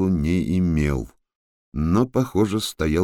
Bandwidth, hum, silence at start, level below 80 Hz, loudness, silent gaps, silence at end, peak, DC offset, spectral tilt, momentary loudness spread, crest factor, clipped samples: 17.5 kHz; none; 0 s; -34 dBFS; -22 LUFS; 1.35-1.72 s; 0 s; -6 dBFS; under 0.1%; -6.5 dB/octave; 8 LU; 16 dB; under 0.1%